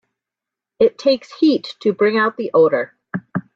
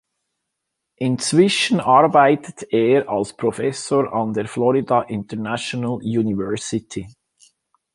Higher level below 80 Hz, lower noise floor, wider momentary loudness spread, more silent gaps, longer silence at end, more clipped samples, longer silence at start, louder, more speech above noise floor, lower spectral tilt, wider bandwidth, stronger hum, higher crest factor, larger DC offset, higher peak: second, -64 dBFS vs -56 dBFS; first, -86 dBFS vs -79 dBFS; about the same, 11 LU vs 11 LU; neither; second, 0.15 s vs 0.85 s; neither; second, 0.8 s vs 1 s; about the same, -18 LUFS vs -19 LUFS; first, 70 dB vs 60 dB; first, -6.5 dB/octave vs -5 dB/octave; second, 7.4 kHz vs 11.5 kHz; neither; about the same, 16 dB vs 18 dB; neither; about the same, -2 dBFS vs -2 dBFS